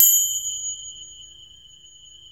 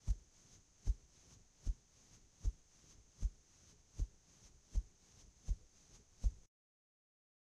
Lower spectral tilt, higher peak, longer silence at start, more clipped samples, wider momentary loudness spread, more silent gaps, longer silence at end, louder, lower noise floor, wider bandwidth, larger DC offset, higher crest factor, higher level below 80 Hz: second, 3.5 dB/octave vs -5.5 dB/octave; first, 0 dBFS vs -24 dBFS; about the same, 0 s vs 0.05 s; neither; first, 27 LU vs 20 LU; neither; about the same, 1.05 s vs 1.1 s; first, -20 LUFS vs -48 LUFS; second, -48 dBFS vs -67 dBFS; first, over 20 kHz vs 9 kHz; first, 0.1% vs under 0.1%; about the same, 24 dB vs 22 dB; second, -62 dBFS vs -46 dBFS